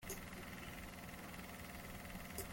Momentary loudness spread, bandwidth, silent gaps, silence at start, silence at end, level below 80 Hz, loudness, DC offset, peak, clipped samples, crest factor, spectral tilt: 2 LU; 17 kHz; none; 0 s; 0 s; -60 dBFS; -50 LUFS; under 0.1%; -32 dBFS; under 0.1%; 20 dB; -3.5 dB/octave